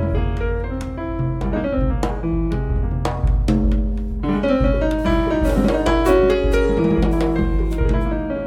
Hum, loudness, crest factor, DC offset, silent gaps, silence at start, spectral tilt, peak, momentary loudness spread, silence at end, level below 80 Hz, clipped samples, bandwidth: none; -20 LUFS; 16 dB; under 0.1%; none; 0 s; -8 dB/octave; -2 dBFS; 7 LU; 0 s; -22 dBFS; under 0.1%; 11.5 kHz